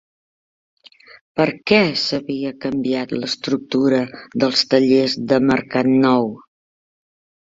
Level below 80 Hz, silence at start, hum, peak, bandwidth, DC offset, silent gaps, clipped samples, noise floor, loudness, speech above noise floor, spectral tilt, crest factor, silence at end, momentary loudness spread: -58 dBFS; 1.35 s; none; 0 dBFS; 7.8 kHz; under 0.1%; none; under 0.1%; under -90 dBFS; -18 LUFS; over 72 dB; -5.5 dB/octave; 18 dB; 1.1 s; 9 LU